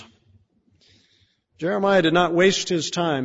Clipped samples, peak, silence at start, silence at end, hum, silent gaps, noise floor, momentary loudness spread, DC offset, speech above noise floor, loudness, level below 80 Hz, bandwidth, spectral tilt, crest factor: under 0.1%; -6 dBFS; 0 s; 0 s; none; none; -63 dBFS; 8 LU; under 0.1%; 44 dB; -20 LUFS; -60 dBFS; 8 kHz; -4.5 dB/octave; 16 dB